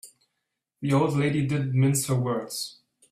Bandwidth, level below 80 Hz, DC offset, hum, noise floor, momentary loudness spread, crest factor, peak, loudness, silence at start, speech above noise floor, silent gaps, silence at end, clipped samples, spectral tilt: 15 kHz; -60 dBFS; under 0.1%; none; -81 dBFS; 10 LU; 16 dB; -10 dBFS; -25 LUFS; 0.05 s; 57 dB; none; 0.4 s; under 0.1%; -5.5 dB/octave